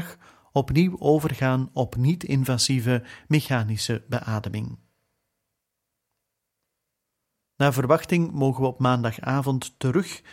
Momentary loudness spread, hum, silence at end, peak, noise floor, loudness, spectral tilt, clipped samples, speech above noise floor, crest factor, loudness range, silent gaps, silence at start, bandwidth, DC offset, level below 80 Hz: 7 LU; none; 0 s; -4 dBFS; -81 dBFS; -24 LUFS; -6 dB/octave; under 0.1%; 58 dB; 20 dB; 11 LU; none; 0 s; 16.5 kHz; under 0.1%; -52 dBFS